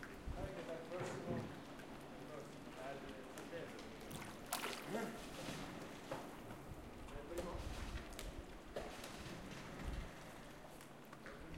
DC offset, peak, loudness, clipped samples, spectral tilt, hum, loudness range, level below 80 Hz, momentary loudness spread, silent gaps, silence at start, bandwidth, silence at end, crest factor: under 0.1%; -22 dBFS; -50 LUFS; under 0.1%; -4.5 dB/octave; none; 3 LU; -58 dBFS; 9 LU; none; 0 s; 16 kHz; 0 s; 28 dB